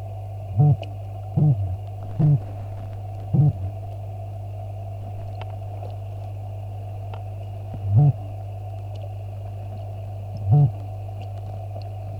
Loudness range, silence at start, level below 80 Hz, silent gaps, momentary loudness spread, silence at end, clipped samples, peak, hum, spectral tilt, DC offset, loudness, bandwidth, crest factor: 9 LU; 0 s; -46 dBFS; none; 14 LU; 0 s; under 0.1%; -8 dBFS; 50 Hz at -30 dBFS; -10.5 dB/octave; under 0.1%; -26 LUFS; 4.5 kHz; 18 dB